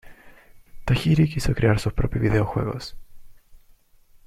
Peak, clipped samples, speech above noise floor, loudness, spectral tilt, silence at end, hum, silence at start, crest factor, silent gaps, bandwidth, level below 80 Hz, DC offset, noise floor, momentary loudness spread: -6 dBFS; under 0.1%; 33 dB; -23 LUFS; -7 dB/octave; 0.7 s; none; 0.05 s; 20 dB; none; 15 kHz; -36 dBFS; under 0.1%; -54 dBFS; 13 LU